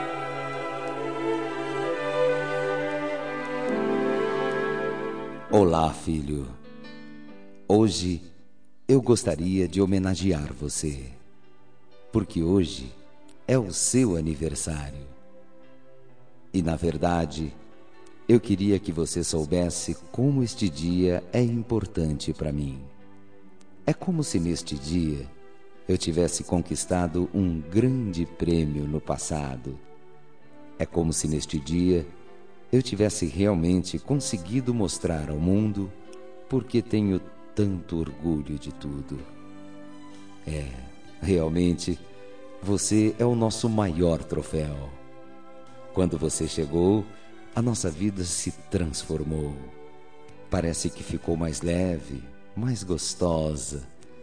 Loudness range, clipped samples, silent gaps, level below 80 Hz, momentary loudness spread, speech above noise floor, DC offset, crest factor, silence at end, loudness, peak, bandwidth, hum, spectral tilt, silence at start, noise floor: 5 LU; under 0.1%; none; -44 dBFS; 17 LU; 36 dB; 0.7%; 20 dB; 0 s; -26 LUFS; -6 dBFS; 10.5 kHz; none; -5.5 dB/octave; 0 s; -61 dBFS